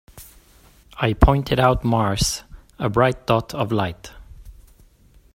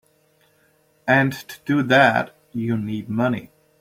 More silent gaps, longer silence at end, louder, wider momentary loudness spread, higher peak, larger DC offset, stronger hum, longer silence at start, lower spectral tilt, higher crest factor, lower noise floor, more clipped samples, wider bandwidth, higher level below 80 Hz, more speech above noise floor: neither; first, 0.85 s vs 0.35 s; about the same, -20 LUFS vs -20 LUFS; second, 11 LU vs 15 LU; about the same, 0 dBFS vs -2 dBFS; neither; neither; second, 0.15 s vs 1.05 s; about the same, -5.5 dB/octave vs -6.5 dB/octave; about the same, 22 dB vs 20 dB; second, -52 dBFS vs -61 dBFS; neither; about the same, 16.5 kHz vs 16 kHz; first, -30 dBFS vs -62 dBFS; second, 33 dB vs 41 dB